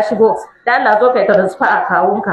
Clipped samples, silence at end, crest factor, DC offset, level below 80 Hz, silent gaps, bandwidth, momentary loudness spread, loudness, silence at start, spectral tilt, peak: under 0.1%; 0 s; 12 dB; under 0.1%; -56 dBFS; none; 11 kHz; 3 LU; -13 LUFS; 0 s; -6.5 dB/octave; 0 dBFS